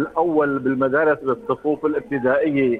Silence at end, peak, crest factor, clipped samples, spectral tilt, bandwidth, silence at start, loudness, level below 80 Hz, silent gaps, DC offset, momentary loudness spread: 0 s; -6 dBFS; 14 dB; under 0.1%; -9 dB/octave; 4.5 kHz; 0 s; -20 LUFS; -56 dBFS; none; under 0.1%; 5 LU